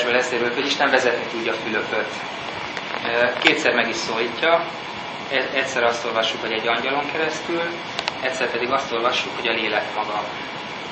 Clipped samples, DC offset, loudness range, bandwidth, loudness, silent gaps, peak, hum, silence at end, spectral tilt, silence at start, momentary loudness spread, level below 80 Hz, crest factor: under 0.1%; under 0.1%; 2 LU; 8.8 kHz; -22 LUFS; none; 0 dBFS; none; 0 s; -3 dB/octave; 0 s; 11 LU; -62 dBFS; 22 dB